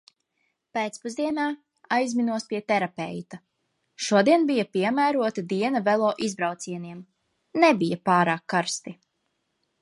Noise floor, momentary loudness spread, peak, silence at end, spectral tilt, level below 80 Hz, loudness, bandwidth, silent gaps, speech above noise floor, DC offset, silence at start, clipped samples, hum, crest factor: -76 dBFS; 14 LU; -6 dBFS; 0.9 s; -5 dB/octave; -74 dBFS; -25 LUFS; 11.5 kHz; none; 52 dB; under 0.1%; 0.75 s; under 0.1%; none; 20 dB